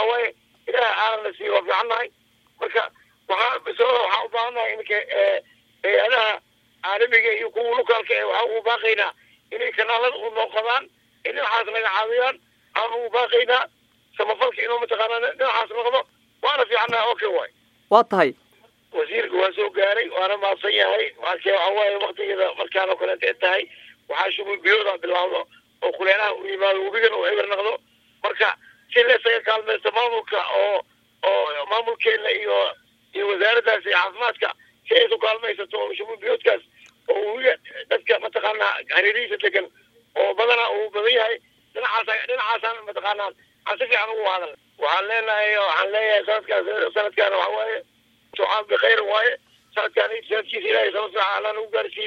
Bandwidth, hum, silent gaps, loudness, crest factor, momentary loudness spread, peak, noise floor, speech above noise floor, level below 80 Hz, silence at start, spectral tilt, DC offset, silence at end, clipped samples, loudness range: 6.6 kHz; none; none; -21 LUFS; 22 dB; 9 LU; 0 dBFS; -55 dBFS; 34 dB; -76 dBFS; 0 s; -3 dB/octave; under 0.1%; 0 s; under 0.1%; 2 LU